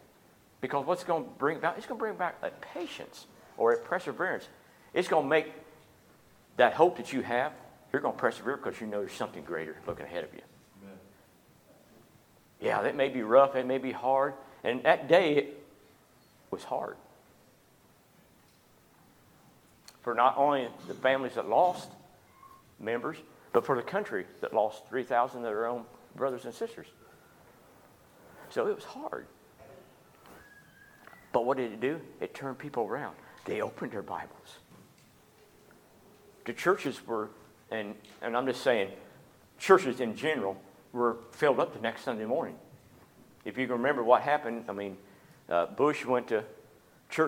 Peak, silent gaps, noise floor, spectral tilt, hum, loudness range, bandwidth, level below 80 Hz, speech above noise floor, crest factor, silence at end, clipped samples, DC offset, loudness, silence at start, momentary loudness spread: -6 dBFS; none; -62 dBFS; -5 dB/octave; none; 11 LU; 18 kHz; -74 dBFS; 32 dB; 26 dB; 0 s; under 0.1%; under 0.1%; -31 LUFS; 0.6 s; 17 LU